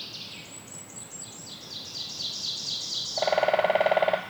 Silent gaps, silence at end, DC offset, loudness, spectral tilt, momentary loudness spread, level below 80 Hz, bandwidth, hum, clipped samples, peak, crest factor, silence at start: none; 0 s; under 0.1%; -28 LUFS; -1.5 dB/octave; 16 LU; -72 dBFS; over 20 kHz; none; under 0.1%; -10 dBFS; 20 dB; 0 s